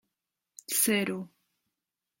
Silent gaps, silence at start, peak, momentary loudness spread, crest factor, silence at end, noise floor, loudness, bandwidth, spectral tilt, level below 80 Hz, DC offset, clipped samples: none; 0.7 s; -12 dBFS; 22 LU; 22 dB; 0.95 s; -88 dBFS; -27 LUFS; 16.5 kHz; -2.5 dB/octave; -76 dBFS; under 0.1%; under 0.1%